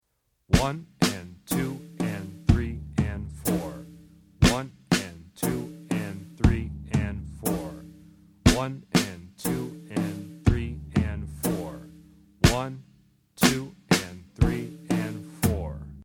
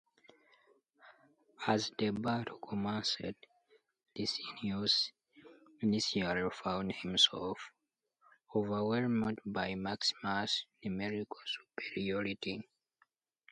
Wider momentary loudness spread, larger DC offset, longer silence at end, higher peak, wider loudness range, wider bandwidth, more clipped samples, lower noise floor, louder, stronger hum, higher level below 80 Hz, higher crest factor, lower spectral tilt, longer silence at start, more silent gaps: about the same, 12 LU vs 11 LU; neither; second, 0 s vs 0.9 s; first, -4 dBFS vs -14 dBFS; about the same, 3 LU vs 5 LU; first, 19.5 kHz vs 11 kHz; neither; second, -68 dBFS vs -78 dBFS; first, -27 LUFS vs -35 LUFS; neither; first, -36 dBFS vs -68 dBFS; about the same, 24 dB vs 24 dB; about the same, -5 dB/octave vs -4 dB/octave; second, 0.5 s vs 1.05 s; neither